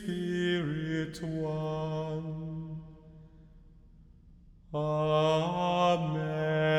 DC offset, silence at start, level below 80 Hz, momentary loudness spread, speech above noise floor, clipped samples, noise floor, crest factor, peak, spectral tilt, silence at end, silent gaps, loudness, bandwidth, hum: under 0.1%; 0 s; -56 dBFS; 13 LU; 25 dB; under 0.1%; -56 dBFS; 16 dB; -16 dBFS; -7 dB/octave; 0 s; none; -31 LUFS; 11 kHz; none